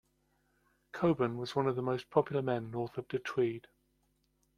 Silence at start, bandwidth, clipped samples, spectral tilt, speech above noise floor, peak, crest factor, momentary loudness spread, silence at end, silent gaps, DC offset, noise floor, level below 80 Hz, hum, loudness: 0.95 s; 12 kHz; under 0.1%; -7.5 dB/octave; 42 dB; -14 dBFS; 22 dB; 8 LU; 1 s; none; under 0.1%; -76 dBFS; -68 dBFS; none; -34 LUFS